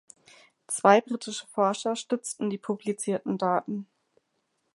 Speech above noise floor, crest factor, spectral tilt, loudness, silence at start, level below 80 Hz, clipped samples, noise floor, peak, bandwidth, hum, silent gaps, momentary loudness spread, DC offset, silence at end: 49 dB; 24 dB; -4.5 dB/octave; -27 LUFS; 0.7 s; -80 dBFS; under 0.1%; -76 dBFS; -4 dBFS; 11.5 kHz; none; none; 13 LU; under 0.1%; 0.9 s